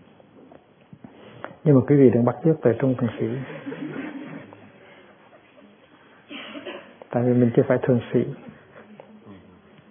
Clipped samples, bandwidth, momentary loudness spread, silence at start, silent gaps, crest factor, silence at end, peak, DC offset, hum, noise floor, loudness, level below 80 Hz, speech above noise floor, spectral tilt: under 0.1%; 3.6 kHz; 23 LU; 1.45 s; none; 22 dB; 0.55 s; -2 dBFS; under 0.1%; none; -53 dBFS; -21 LUFS; -66 dBFS; 33 dB; -12.5 dB/octave